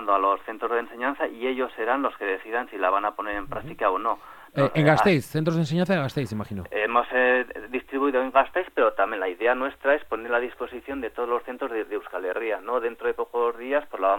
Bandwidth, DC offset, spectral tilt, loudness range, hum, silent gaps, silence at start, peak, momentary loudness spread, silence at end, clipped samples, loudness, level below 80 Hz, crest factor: 17.5 kHz; under 0.1%; -7 dB/octave; 5 LU; none; none; 0 s; -6 dBFS; 10 LU; 0 s; under 0.1%; -25 LUFS; -56 dBFS; 20 dB